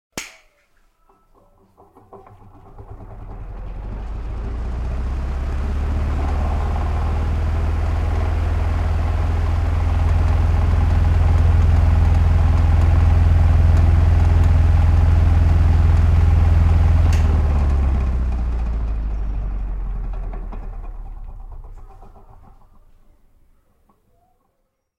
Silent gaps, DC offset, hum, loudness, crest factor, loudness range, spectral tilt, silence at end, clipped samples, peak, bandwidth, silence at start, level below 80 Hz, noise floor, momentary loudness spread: none; under 0.1%; none; -19 LUFS; 12 dB; 18 LU; -8 dB/octave; 2.95 s; under 0.1%; -6 dBFS; 7.6 kHz; 0.15 s; -20 dBFS; -69 dBFS; 18 LU